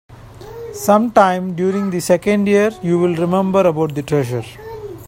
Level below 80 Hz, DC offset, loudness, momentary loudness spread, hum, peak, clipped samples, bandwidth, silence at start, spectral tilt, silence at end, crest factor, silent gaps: -48 dBFS; under 0.1%; -16 LUFS; 18 LU; none; 0 dBFS; under 0.1%; 16.5 kHz; 0.1 s; -6.5 dB/octave; 0 s; 16 dB; none